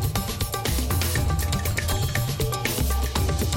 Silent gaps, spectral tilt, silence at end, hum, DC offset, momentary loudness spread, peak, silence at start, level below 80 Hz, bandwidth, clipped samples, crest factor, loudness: none; -4 dB/octave; 0 s; none; under 0.1%; 3 LU; -10 dBFS; 0 s; -30 dBFS; 17 kHz; under 0.1%; 14 dB; -25 LUFS